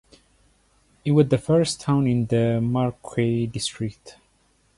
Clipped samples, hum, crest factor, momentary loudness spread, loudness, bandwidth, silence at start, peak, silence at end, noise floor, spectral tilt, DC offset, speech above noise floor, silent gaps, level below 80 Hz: under 0.1%; none; 18 dB; 9 LU; -23 LUFS; 11.5 kHz; 1.05 s; -6 dBFS; 0.65 s; -63 dBFS; -6.5 dB/octave; under 0.1%; 41 dB; none; -52 dBFS